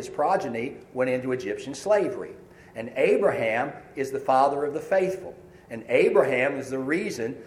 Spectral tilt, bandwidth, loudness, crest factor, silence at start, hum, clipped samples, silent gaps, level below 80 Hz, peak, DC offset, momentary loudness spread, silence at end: -5.5 dB/octave; 15 kHz; -25 LUFS; 20 dB; 0 s; none; under 0.1%; none; -64 dBFS; -4 dBFS; under 0.1%; 15 LU; 0 s